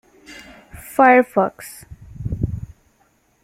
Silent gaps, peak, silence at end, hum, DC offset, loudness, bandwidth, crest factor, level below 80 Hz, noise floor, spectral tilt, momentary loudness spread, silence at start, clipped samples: none; -2 dBFS; 0.8 s; none; under 0.1%; -17 LUFS; 16 kHz; 20 dB; -42 dBFS; -61 dBFS; -6.5 dB/octave; 27 LU; 0.3 s; under 0.1%